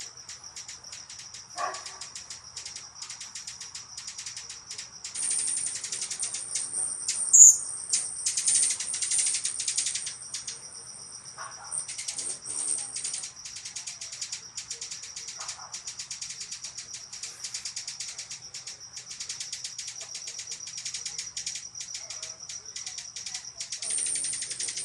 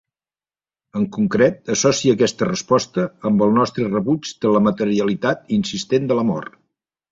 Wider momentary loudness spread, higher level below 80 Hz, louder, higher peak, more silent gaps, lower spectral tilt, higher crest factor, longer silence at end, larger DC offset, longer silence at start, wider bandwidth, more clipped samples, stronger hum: first, 14 LU vs 7 LU; second, -70 dBFS vs -56 dBFS; second, -27 LUFS vs -19 LUFS; about the same, 0 dBFS vs -2 dBFS; neither; second, 2.5 dB/octave vs -5 dB/octave; first, 32 dB vs 16 dB; second, 0 s vs 0.65 s; neither; second, 0 s vs 0.95 s; first, 13 kHz vs 8 kHz; neither; neither